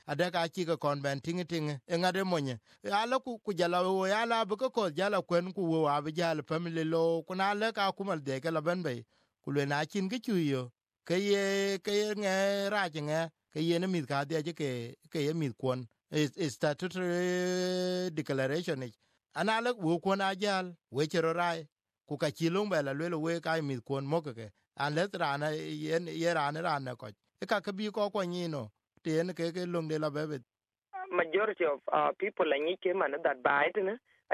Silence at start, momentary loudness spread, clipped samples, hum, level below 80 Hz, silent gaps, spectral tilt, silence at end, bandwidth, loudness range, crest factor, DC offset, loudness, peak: 0.05 s; 8 LU; under 0.1%; none; -78 dBFS; 21.72-21.76 s; -5.5 dB/octave; 0 s; 14.5 kHz; 3 LU; 20 dB; under 0.1%; -33 LUFS; -12 dBFS